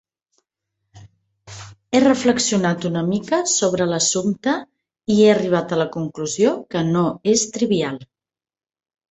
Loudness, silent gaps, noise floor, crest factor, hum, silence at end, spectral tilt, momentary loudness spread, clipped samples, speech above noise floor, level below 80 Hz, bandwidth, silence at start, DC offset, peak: -19 LUFS; none; under -90 dBFS; 18 dB; none; 1.05 s; -4.5 dB/octave; 11 LU; under 0.1%; over 71 dB; -58 dBFS; 8.4 kHz; 0.95 s; under 0.1%; -2 dBFS